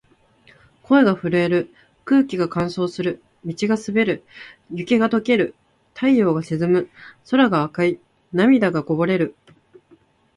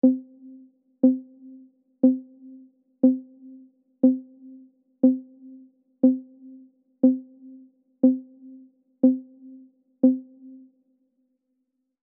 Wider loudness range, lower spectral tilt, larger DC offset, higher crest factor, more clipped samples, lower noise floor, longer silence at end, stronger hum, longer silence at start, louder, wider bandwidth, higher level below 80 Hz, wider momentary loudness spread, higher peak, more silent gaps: about the same, 3 LU vs 2 LU; second, -7 dB/octave vs -11.5 dB/octave; neither; about the same, 18 dB vs 20 dB; neither; second, -55 dBFS vs -77 dBFS; second, 1.05 s vs 1.8 s; neither; first, 0.9 s vs 0.05 s; first, -20 LUFS vs -23 LUFS; first, 11 kHz vs 1.1 kHz; first, -58 dBFS vs -86 dBFS; first, 16 LU vs 10 LU; first, -2 dBFS vs -6 dBFS; neither